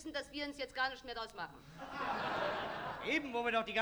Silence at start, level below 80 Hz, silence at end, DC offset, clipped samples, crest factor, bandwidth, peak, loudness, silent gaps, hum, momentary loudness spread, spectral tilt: 0 s; -66 dBFS; 0 s; under 0.1%; under 0.1%; 20 dB; over 20 kHz; -20 dBFS; -39 LUFS; none; none; 11 LU; -4 dB/octave